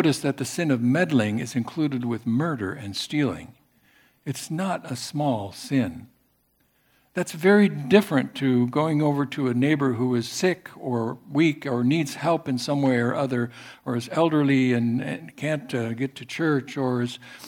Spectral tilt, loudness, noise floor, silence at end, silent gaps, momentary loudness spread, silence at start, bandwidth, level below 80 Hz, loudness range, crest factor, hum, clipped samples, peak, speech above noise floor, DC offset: -6 dB/octave; -24 LUFS; -67 dBFS; 0 s; none; 10 LU; 0 s; 18 kHz; -66 dBFS; 7 LU; 22 dB; none; under 0.1%; -2 dBFS; 43 dB; under 0.1%